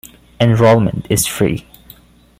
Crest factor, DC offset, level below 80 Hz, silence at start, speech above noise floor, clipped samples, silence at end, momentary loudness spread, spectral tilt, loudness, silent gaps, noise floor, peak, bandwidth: 14 dB; under 0.1%; -40 dBFS; 0.4 s; 31 dB; under 0.1%; 0.8 s; 7 LU; -5.5 dB/octave; -14 LUFS; none; -44 dBFS; 0 dBFS; 16 kHz